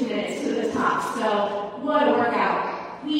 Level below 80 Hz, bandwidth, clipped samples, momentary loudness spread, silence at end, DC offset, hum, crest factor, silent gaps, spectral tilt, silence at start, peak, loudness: -64 dBFS; 15.5 kHz; under 0.1%; 7 LU; 0 s; under 0.1%; none; 16 dB; none; -4.5 dB/octave; 0 s; -8 dBFS; -24 LUFS